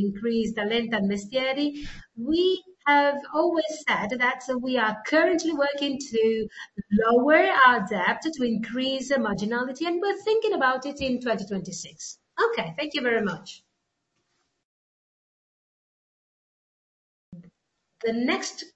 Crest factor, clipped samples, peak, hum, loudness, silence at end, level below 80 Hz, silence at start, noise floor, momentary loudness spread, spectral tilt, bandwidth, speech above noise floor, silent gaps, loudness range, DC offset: 22 dB; under 0.1%; -4 dBFS; none; -24 LUFS; 0.1 s; -56 dBFS; 0 s; -78 dBFS; 11 LU; -4.5 dB/octave; 8.2 kHz; 53 dB; 14.65-17.32 s; 10 LU; under 0.1%